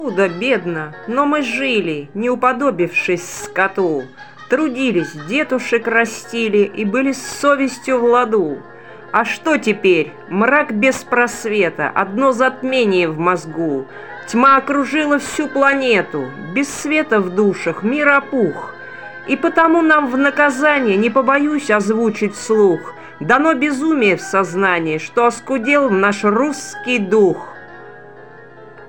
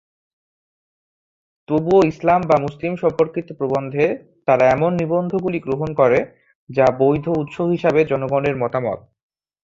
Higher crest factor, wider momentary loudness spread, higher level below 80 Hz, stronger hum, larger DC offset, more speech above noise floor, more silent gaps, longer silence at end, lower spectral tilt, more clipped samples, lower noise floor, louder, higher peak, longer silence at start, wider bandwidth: about the same, 16 dB vs 18 dB; about the same, 9 LU vs 8 LU; second, -60 dBFS vs -52 dBFS; neither; first, 0.5% vs under 0.1%; second, 23 dB vs over 72 dB; second, none vs 6.55-6.67 s; second, 0 s vs 0.65 s; second, -5 dB/octave vs -8 dB/octave; neither; second, -39 dBFS vs under -90 dBFS; first, -16 LUFS vs -19 LUFS; about the same, 0 dBFS vs -2 dBFS; second, 0 s vs 1.7 s; first, 17 kHz vs 7.6 kHz